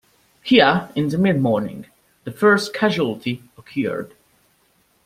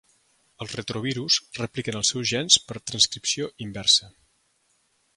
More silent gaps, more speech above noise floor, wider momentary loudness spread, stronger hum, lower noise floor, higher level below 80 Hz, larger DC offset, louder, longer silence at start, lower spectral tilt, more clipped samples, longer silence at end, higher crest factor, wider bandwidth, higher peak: neither; about the same, 42 dB vs 43 dB; first, 20 LU vs 14 LU; neither; second, -61 dBFS vs -68 dBFS; about the same, -58 dBFS vs -60 dBFS; neither; first, -19 LUFS vs -23 LUFS; second, 0.45 s vs 0.6 s; first, -6 dB/octave vs -2 dB/octave; neither; about the same, 1 s vs 1.05 s; second, 20 dB vs 26 dB; first, 16 kHz vs 11.5 kHz; about the same, -2 dBFS vs -2 dBFS